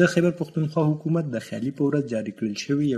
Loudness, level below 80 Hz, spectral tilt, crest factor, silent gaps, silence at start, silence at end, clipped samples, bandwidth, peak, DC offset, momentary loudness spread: -25 LUFS; -64 dBFS; -7 dB/octave; 18 dB; none; 0 s; 0 s; under 0.1%; 12.5 kHz; -6 dBFS; under 0.1%; 6 LU